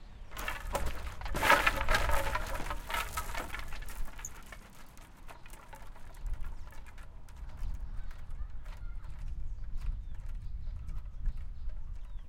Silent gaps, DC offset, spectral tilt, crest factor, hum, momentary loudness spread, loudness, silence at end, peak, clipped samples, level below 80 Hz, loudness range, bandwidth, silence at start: none; under 0.1%; -3.5 dB/octave; 26 dB; none; 21 LU; -36 LUFS; 0 s; -8 dBFS; under 0.1%; -38 dBFS; 17 LU; 17 kHz; 0 s